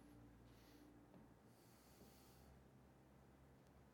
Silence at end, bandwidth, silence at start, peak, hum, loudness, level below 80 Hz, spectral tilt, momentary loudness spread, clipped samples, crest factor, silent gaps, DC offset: 0 s; 18 kHz; 0 s; -52 dBFS; none; -68 LUFS; -76 dBFS; -5.5 dB/octave; 3 LU; under 0.1%; 16 dB; none; under 0.1%